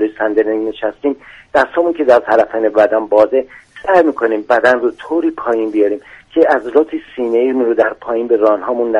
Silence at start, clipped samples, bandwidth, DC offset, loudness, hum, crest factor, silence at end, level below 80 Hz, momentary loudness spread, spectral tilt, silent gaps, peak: 0 s; under 0.1%; 9.6 kHz; under 0.1%; -14 LUFS; none; 14 dB; 0 s; -52 dBFS; 9 LU; -6 dB/octave; none; 0 dBFS